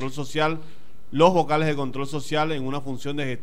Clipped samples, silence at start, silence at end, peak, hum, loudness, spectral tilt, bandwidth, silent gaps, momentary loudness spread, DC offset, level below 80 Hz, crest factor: under 0.1%; 0 s; 0 s; -2 dBFS; none; -24 LUFS; -6 dB/octave; 15.5 kHz; none; 12 LU; 4%; -56 dBFS; 22 dB